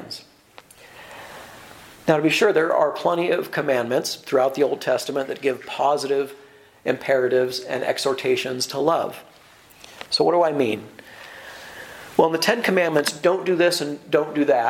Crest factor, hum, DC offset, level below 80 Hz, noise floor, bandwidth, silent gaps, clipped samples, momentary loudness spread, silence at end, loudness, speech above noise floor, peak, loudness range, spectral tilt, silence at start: 20 dB; none; under 0.1%; -66 dBFS; -50 dBFS; 17 kHz; none; under 0.1%; 20 LU; 0 s; -21 LUFS; 29 dB; -2 dBFS; 3 LU; -4 dB/octave; 0 s